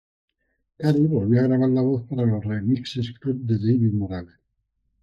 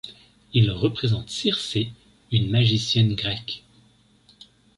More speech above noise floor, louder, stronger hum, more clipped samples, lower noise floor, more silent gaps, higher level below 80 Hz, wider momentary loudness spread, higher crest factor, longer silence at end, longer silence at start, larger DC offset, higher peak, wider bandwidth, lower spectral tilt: first, 53 dB vs 36 dB; about the same, -22 LUFS vs -23 LUFS; neither; neither; first, -74 dBFS vs -58 dBFS; neither; second, -58 dBFS vs -48 dBFS; second, 9 LU vs 12 LU; about the same, 16 dB vs 18 dB; second, 0.8 s vs 1.2 s; first, 0.8 s vs 0.05 s; neither; about the same, -6 dBFS vs -6 dBFS; second, 7.4 kHz vs 11.5 kHz; first, -9 dB/octave vs -5.5 dB/octave